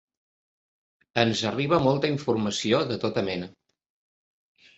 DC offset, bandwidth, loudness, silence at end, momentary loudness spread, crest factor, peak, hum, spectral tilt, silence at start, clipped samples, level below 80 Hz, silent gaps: under 0.1%; 8.2 kHz; -25 LUFS; 1.3 s; 9 LU; 24 dB; -4 dBFS; none; -5 dB/octave; 1.15 s; under 0.1%; -58 dBFS; none